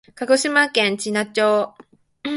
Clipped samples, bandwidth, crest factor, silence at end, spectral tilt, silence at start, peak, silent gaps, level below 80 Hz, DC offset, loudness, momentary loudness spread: under 0.1%; 11.5 kHz; 18 dB; 0 s; -3 dB/octave; 0.2 s; -2 dBFS; none; -68 dBFS; under 0.1%; -18 LUFS; 9 LU